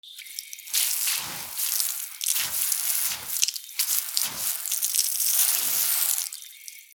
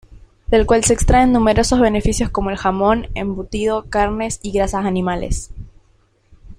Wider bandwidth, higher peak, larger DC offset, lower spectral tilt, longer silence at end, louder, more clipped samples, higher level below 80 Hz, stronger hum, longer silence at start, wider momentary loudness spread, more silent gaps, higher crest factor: first, over 20 kHz vs 15.5 kHz; about the same, 0 dBFS vs 0 dBFS; neither; second, 3 dB/octave vs -5 dB/octave; about the same, 0.1 s vs 0.05 s; second, -23 LUFS vs -17 LUFS; neither; second, -72 dBFS vs -28 dBFS; neither; about the same, 0.05 s vs 0.1 s; first, 14 LU vs 10 LU; neither; first, 28 dB vs 18 dB